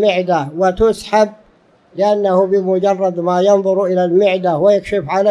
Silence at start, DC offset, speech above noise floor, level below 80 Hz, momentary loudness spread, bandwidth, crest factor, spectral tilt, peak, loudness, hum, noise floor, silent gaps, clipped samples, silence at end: 0 s; under 0.1%; 38 dB; -42 dBFS; 5 LU; 11.5 kHz; 14 dB; -6.5 dB/octave; 0 dBFS; -14 LUFS; none; -51 dBFS; none; under 0.1%; 0 s